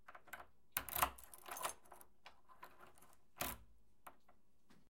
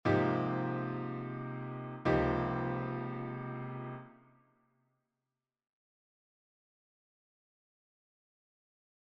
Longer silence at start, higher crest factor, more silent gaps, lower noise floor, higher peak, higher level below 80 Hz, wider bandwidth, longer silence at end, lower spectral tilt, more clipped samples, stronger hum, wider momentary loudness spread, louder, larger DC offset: about the same, 0.1 s vs 0.05 s; first, 32 dB vs 22 dB; neither; second, -76 dBFS vs under -90 dBFS; about the same, -18 dBFS vs -16 dBFS; second, -68 dBFS vs -58 dBFS; first, 17 kHz vs 6.2 kHz; second, 0.15 s vs 4.9 s; second, -1.5 dB/octave vs -9 dB/octave; neither; neither; first, 24 LU vs 12 LU; second, -45 LUFS vs -36 LUFS; neither